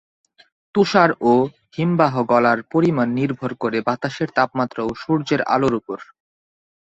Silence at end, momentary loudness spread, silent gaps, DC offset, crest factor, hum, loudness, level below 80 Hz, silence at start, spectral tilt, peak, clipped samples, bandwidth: 0.8 s; 9 LU; none; under 0.1%; 18 dB; none; -19 LUFS; -56 dBFS; 0.75 s; -7 dB/octave; -2 dBFS; under 0.1%; 8 kHz